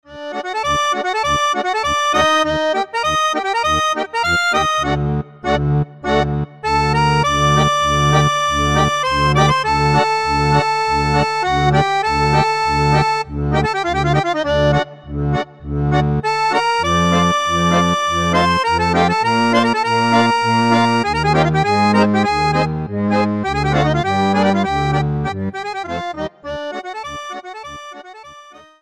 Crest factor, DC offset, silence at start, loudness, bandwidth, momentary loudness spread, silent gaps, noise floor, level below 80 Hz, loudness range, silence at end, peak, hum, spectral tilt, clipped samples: 14 dB; 0.3%; 0.1 s; -16 LUFS; 12.5 kHz; 10 LU; none; -41 dBFS; -34 dBFS; 4 LU; 0.25 s; -2 dBFS; none; -5 dB/octave; under 0.1%